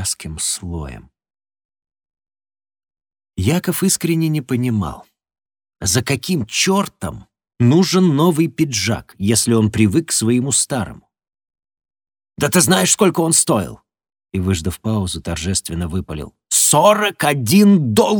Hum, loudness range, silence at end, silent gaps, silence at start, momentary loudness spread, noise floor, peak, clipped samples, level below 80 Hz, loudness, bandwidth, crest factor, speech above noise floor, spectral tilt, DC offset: none; 6 LU; 0 s; 1.65-1.69 s; 0 s; 12 LU; under -90 dBFS; 0 dBFS; under 0.1%; -42 dBFS; -16 LUFS; over 20 kHz; 18 dB; over 74 dB; -4 dB/octave; under 0.1%